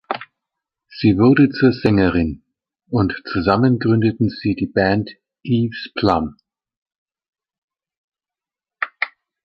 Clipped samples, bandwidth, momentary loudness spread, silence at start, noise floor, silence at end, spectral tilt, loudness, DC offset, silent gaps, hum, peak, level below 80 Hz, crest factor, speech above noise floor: under 0.1%; 5.8 kHz; 15 LU; 0.1 s; under -90 dBFS; 0.4 s; -9 dB/octave; -18 LUFS; under 0.1%; 6.77-6.86 s, 6.98-7.06 s, 7.29-7.33 s, 7.58-7.68 s, 7.97-8.08 s; none; -2 dBFS; -42 dBFS; 18 dB; over 74 dB